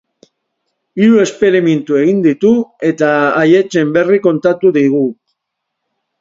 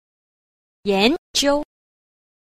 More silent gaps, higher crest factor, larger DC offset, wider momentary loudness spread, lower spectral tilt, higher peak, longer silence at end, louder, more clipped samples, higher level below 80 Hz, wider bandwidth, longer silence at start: second, none vs 1.18-1.34 s; second, 12 dB vs 20 dB; neither; second, 4 LU vs 11 LU; first, -6.5 dB/octave vs -3 dB/octave; about the same, 0 dBFS vs -2 dBFS; first, 1.1 s vs 0.85 s; first, -12 LUFS vs -20 LUFS; neither; second, -58 dBFS vs -48 dBFS; second, 7.8 kHz vs 15 kHz; about the same, 0.95 s vs 0.85 s